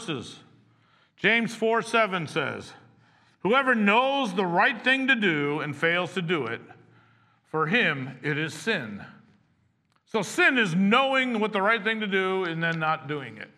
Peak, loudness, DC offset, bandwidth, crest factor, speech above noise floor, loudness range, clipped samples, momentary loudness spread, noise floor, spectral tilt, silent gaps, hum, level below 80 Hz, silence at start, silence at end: -6 dBFS; -24 LUFS; under 0.1%; 13 kHz; 20 dB; 43 dB; 5 LU; under 0.1%; 12 LU; -68 dBFS; -5 dB/octave; none; none; -78 dBFS; 0 s; 0.1 s